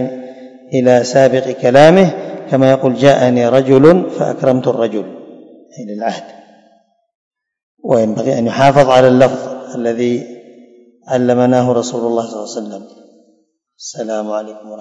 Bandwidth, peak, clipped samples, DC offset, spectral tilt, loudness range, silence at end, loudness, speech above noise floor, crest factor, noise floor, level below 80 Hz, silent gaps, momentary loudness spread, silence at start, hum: 11 kHz; 0 dBFS; 0.9%; under 0.1%; -6.5 dB/octave; 10 LU; 0 s; -12 LUFS; 46 dB; 14 dB; -58 dBFS; -52 dBFS; 7.15-7.31 s, 7.63-7.77 s; 20 LU; 0 s; none